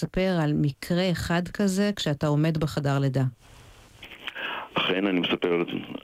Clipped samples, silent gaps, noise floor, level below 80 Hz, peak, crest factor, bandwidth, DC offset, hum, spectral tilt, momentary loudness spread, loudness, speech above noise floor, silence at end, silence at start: under 0.1%; none; -48 dBFS; -50 dBFS; -14 dBFS; 12 dB; 15.5 kHz; under 0.1%; none; -6 dB/octave; 8 LU; -26 LUFS; 23 dB; 0.05 s; 0 s